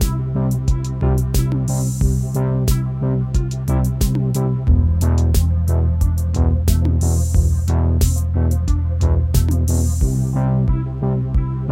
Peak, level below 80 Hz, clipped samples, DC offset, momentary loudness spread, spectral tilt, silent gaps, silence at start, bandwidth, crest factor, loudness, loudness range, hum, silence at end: -2 dBFS; -20 dBFS; under 0.1%; under 0.1%; 4 LU; -7 dB/octave; none; 0 s; 16.5 kHz; 14 dB; -18 LUFS; 2 LU; none; 0 s